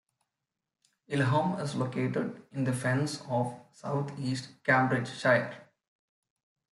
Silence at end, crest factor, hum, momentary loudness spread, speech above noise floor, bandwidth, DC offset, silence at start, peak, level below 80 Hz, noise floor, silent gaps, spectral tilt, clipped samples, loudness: 1.1 s; 20 dB; none; 9 LU; 58 dB; 12 kHz; under 0.1%; 1.1 s; -12 dBFS; -72 dBFS; -88 dBFS; none; -6 dB/octave; under 0.1%; -30 LUFS